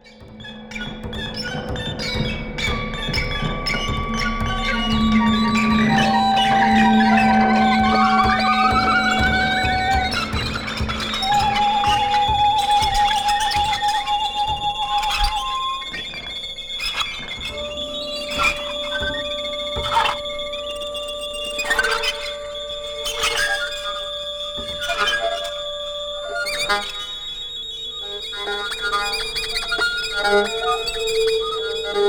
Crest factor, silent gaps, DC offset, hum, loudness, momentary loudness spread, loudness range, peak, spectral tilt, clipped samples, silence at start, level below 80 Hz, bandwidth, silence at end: 16 dB; none; under 0.1%; none; -20 LUFS; 11 LU; 8 LU; -4 dBFS; -3.5 dB/octave; under 0.1%; 0.05 s; -34 dBFS; over 20 kHz; 0 s